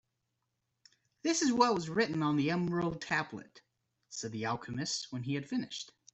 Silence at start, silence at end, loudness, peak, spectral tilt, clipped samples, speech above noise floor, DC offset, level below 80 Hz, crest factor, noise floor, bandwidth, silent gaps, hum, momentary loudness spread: 1.25 s; 0.3 s; -33 LUFS; -12 dBFS; -4.5 dB/octave; under 0.1%; 50 dB; under 0.1%; -70 dBFS; 22 dB; -84 dBFS; 8.2 kHz; none; none; 13 LU